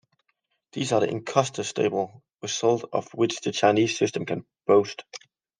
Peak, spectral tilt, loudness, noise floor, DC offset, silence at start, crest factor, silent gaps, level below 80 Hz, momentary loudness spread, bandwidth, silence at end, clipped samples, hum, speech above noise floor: -6 dBFS; -4.5 dB/octave; -25 LUFS; -75 dBFS; under 0.1%; 0.75 s; 20 dB; none; -72 dBFS; 14 LU; 10 kHz; 0.45 s; under 0.1%; none; 50 dB